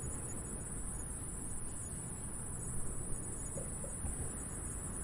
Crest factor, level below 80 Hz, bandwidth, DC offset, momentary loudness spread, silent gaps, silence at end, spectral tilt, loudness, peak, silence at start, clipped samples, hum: 16 dB; -48 dBFS; 11.5 kHz; under 0.1%; 2 LU; none; 0 s; -4.5 dB/octave; -41 LUFS; -26 dBFS; 0 s; under 0.1%; none